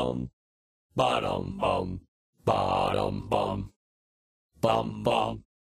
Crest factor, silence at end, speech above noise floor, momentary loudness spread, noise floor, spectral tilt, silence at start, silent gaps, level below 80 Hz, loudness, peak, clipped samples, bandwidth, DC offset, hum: 18 dB; 0.4 s; over 62 dB; 11 LU; under -90 dBFS; -6 dB/octave; 0 s; 0.33-0.90 s, 2.08-2.33 s, 3.76-4.49 s; -50 dBFS; -29 LUFS; -12 dBFS; under 0.1%; 15.5 kHz; under 0.1%; none